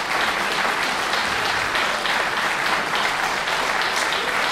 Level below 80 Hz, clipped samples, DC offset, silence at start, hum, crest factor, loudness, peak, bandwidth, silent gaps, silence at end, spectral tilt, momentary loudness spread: -50 dBFS; under 0.1%; under 0.1%; 0 s; none; 14 dB; -20 LUFS; -8 dBFS; 16 kHz; none; 0 s; -1 dB/octave; 1 LU